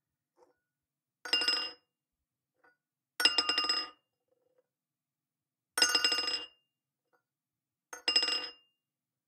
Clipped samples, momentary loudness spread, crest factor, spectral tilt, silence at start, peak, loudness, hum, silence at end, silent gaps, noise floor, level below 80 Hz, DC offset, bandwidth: under 0.1%; 19 LU; 28 dB; 1.5 dB/octave; 1.25 s; -10 dBFS; -29 LUFS; none; 0.75 s; none; under -90 dBFS; -76 dBFS; under 0.1%; 16.5 kHz